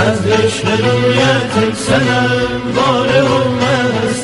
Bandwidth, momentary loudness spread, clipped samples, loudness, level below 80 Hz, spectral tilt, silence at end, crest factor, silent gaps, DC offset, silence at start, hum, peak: 11.5 kHz; 4 LU; under 0.1%; -13 LUFS; -40 dBFS; -5 dB/octave; 0 s; 12 dB; none; under 0.1%; 0 s; none; 0 dBFS